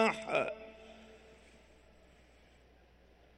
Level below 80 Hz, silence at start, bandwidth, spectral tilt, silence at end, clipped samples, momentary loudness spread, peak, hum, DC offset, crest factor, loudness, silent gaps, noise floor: -66 dBFS; 0 s; 12 kHz; -4 dB/octave; 2.05 s; under 0.1%; 26 LU; -16 dBFS; none; under 0.1%; 24 dB; -35 LUFS; none; -63 dBFS